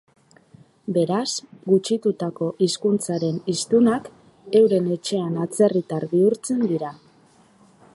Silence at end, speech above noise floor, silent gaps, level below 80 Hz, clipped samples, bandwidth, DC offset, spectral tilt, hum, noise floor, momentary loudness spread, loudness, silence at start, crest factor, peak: 1 s; 34 dB; none; -68 dBFS; under 0.1%; 11.5 kHz; under 0.1%; -5.5 dB/octave; none; -55 dBFS; 8 LU; -22 LUFS; 0.85 s; 16 dB; -6 dBFS